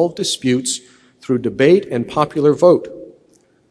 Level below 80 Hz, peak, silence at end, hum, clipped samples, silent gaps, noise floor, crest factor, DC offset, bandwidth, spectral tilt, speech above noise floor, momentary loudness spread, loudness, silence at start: -56 dBFS; 0 dBFS; 0.6 s; none; under 0.1%; none; -55 dBFS; 16 dB; under 0.1%; 11 kHz; -5 dB/octave; 39 dB; 10 LU; -16 LUFS; 0 s